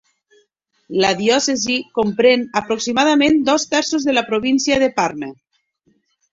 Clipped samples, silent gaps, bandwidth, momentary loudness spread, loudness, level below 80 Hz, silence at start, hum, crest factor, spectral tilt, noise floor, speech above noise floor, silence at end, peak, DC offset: under 0.1%; none; 7.8 kHz; 7 LU; -17 LUFS; -54 dBFS; 0.9 s; none; 16 dB; -3 dB/octave; -63 dBFS; 47 dB; 1 s; -2 dBFS; under 0.1%